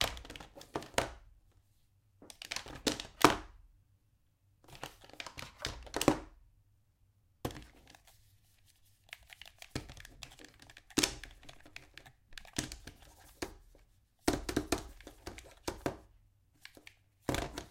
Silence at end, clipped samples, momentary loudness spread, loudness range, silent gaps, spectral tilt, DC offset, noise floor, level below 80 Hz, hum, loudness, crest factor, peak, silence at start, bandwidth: 0 s; under 0.1%; 24 LU; 14 LU; none; -3.5 dB/octave; under 0.1%; -72 dBFS; -56 dBFS; none; -37 LUFS; 40 dB; 0 dBFS; 0 s; 16.5 kHz